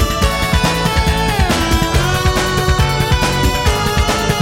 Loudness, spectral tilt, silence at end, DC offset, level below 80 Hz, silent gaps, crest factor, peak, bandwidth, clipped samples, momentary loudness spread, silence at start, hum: -14 LUFS; -4.5 dB/octave; 0 s; under 0.1%; -20 dBFS; none; 14 dB; 0 dBFS; 16.5 kHz; under 0.1%; 1 LU; 0 s; none